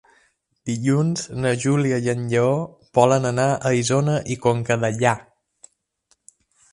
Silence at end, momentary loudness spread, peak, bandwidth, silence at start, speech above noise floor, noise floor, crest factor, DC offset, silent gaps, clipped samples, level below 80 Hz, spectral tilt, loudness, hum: 1.5 s; 6 LU; 0 dBFS; 11.5 kHz; 0.65 s; 46 dB; -66 dBFS; 20 dB; under 0.1%; none; under 0.1%; -56 dBFS; -6 dB/octave; -21 LUFS; none